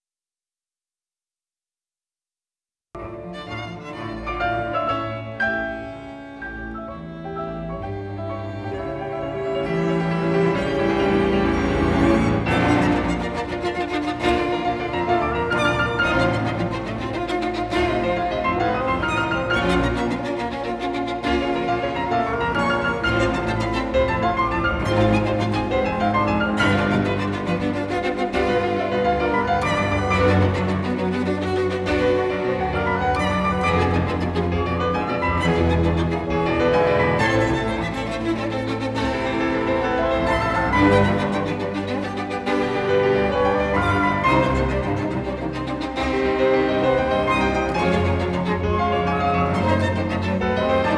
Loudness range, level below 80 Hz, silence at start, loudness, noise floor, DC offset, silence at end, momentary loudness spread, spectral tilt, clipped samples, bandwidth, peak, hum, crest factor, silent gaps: 6 LU; -36 dBFS; 2.95 s; -21 LUFS; under -90 dBFS; under 0.1%; 0 s; 9 LU; -6.5 dB/octave; under 0.1%; 11 kHz; -4 dBFS; none; 16 dB; none